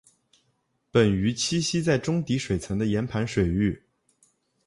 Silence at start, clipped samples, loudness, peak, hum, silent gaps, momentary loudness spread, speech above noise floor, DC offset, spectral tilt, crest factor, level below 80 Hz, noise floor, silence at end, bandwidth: 0.95 s; under 0.1%; -25 LUFS; -8 dBFS; none; none; 5 LU; 48 dB; under 0.1%; -5.5 dB/octave; 20 dB; -46 dBFS; -72 dBFS; 0.9 s; 11.5 kHz